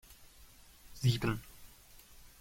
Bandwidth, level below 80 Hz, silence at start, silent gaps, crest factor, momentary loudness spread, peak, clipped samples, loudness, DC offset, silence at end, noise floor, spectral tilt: 16.5 kHz; -54 dBFS; 0.1 s; none; 22 dB; 26 LU; -18 dBFS; under 0.1%; -35 LUFS; under 0.1%; 0.75 s; -58 dBFS; -5.5 dB/octave